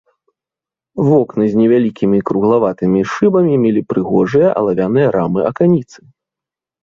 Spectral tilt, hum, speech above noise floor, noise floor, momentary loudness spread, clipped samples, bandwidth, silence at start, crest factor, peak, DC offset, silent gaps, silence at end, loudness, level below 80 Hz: -9 dB/octave; none; 75 dB; -88 dBFS; 4 LU; under 0.1%; 7.2 kHz; 0.95 s; 12 dB; -2 dBFS; under 0.1%; none; 1 s; -14 LUFS; -50 dBFS